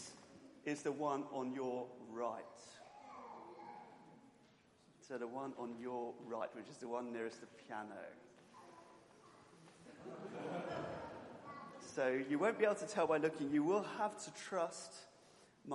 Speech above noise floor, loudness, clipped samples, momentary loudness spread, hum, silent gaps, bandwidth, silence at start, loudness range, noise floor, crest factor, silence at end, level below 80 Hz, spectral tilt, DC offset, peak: 28 dB; -42 LUFS; under 0.1%; 24 LU; none; none; 11.5 kHz; 0 s; 14 LU; -69 dBFS; 22 dB; 0 s; -84 dBFS; -5 dB/octave; under 0.1%; -22 dBFS